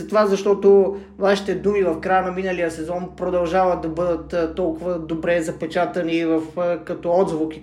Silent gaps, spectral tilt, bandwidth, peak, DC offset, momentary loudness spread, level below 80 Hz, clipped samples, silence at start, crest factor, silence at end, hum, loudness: none; -6 dB/octave; 11.5 kHz; -4 dBFS; under 0.1%; 7 LU; -46 dBFS; under 0.1%; 0 s; 16 dB; 0 s; none; -21 LUFS